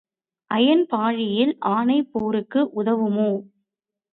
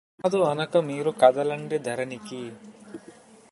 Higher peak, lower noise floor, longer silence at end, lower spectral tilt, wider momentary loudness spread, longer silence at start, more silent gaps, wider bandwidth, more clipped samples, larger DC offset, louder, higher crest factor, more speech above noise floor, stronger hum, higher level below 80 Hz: about the same, -6 dBFS vs -4 dBFS; first, -83 dBFS vs -50 dBFS; first, 0.7 s vs 0.4 s; first, -9.5 dB/octave vs -5.5 dB/octave; second, 6 LU vs 24 LU; first, 0.5 s vs 0.2 s; neither; second, 4.4 kHz vs 11.5 kHz; neither; neither; first, -21 LUFS vs -24 LUFS; second, 16 dB vs 22 dB; first, 62 dB vs 26 dB; neither; first, -66 dBFS vs -72 dBFS